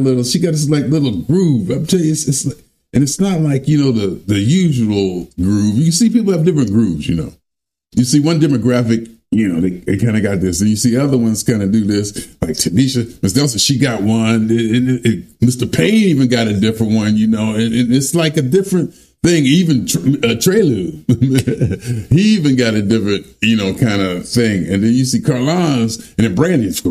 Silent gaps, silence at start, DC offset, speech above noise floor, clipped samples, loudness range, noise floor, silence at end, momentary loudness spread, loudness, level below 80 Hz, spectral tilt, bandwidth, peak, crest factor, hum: none; 0 s; under 0.1%; 67 dB; under 0.1%; 2 LU; -80 dBFS; 0 s; 6 LU; -14 LUFS; -44 dBFS; -5.5 dB/octave; 15.5 kHz; 0 dBFS; 14 dB; none